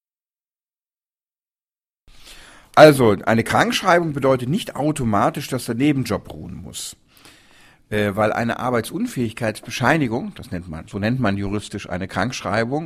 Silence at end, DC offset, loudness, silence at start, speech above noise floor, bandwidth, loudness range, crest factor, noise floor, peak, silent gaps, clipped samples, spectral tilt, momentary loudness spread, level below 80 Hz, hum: 0 s; under 0.1%; -19 LUFS; 2.25 s; over 71 dB; 16 kHz; 8 LU; 20 dB; under -90 dBFS; 0 dBFS; none; under 0.1%; -5.5 dB/octave; 14 LU; -48 dBFS; none